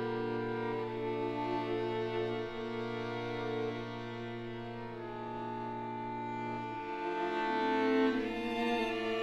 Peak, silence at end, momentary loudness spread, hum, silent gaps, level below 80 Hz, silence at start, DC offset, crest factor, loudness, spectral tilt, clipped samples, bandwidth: -18 dBFS; 0 s; 10 LU; none; none; -60 dBFS; 0 s; under 0.1%; 18 dB; -36 LUFS; -6.5 dB/octave; under 0.1%; 11.5 kHz